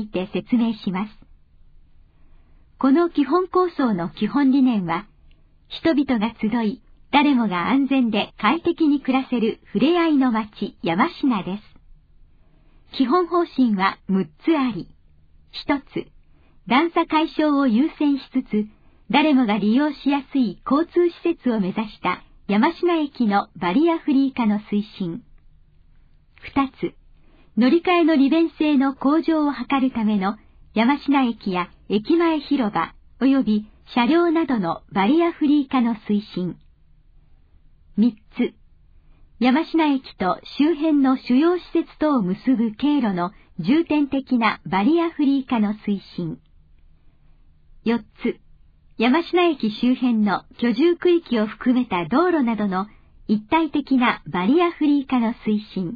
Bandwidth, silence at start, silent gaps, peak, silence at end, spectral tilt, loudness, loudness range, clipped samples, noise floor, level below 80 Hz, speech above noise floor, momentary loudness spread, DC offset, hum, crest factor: 5 kHz; 0 s; none; -4 dBFS; 0 s; -8.5 dB/octave; -21 LUFS; 4 LU; under 0.1%; -52 dBFS; -52 dBFS; 32 dB; 10 LU; under 0.1%; none; 18 dB